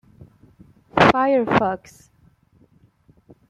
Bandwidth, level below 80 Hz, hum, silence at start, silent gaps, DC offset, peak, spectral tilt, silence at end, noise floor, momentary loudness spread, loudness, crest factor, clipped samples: 12.5 kHz; -50 dBFS; none; 0.2 s; none; under 0.1%; -2 dBFS; -6 dB/octave; 1.75 s; -57 dBFS; 11 LU; -18 LUFS; 22 dB; under 0.1%